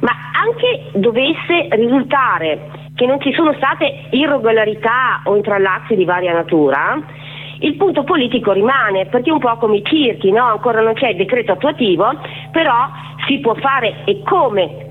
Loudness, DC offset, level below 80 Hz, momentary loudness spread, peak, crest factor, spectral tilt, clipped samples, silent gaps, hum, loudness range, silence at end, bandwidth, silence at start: -15 LUFS; under 0.1%; -52 dBFS; 5 LU; -2 dBFS; 12 dB; -7.5 dB/octave; under 0.1%; none; none; 1 LU; 0 s; 4.2 kHz; 0 s